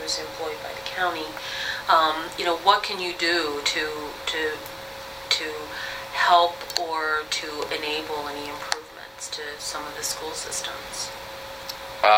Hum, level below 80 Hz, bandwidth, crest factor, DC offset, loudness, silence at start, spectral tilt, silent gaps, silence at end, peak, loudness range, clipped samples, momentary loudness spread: none; -56 dBFS; 16.5 kHz; 22 dB; under 0.1%; -25 LUFS; 0 s; -1 dB/octave; none; 0 s; -4 dBFS; 7 LU; under 0.1%; 14 LU